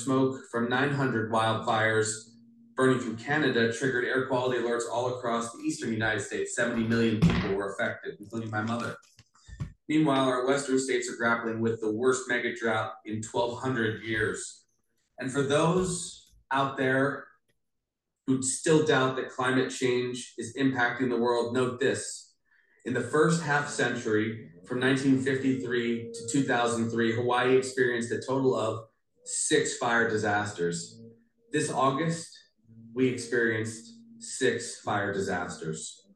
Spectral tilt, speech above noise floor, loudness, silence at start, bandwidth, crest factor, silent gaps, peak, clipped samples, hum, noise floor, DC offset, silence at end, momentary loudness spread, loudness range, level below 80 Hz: -4.5 dB/octave; 57 dB; -28 LUFS; 0 s; 12 kHz; 18 dB; none; -10 dBFS; under 0.1%; none; -85 dBFS; under 0.1%; 0.2 s; 12 LU; 3 LU; -58 dBFS